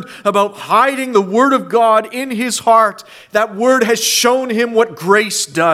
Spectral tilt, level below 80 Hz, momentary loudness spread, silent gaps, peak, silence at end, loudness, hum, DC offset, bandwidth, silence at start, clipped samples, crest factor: -3 dB/octave; -62 dBFS; 6 LU; none; 0 dBFS; 0 s; -13 LUFS; none; under 0.1%; 16 kHz; 0 s; under 0.1%; 14 dB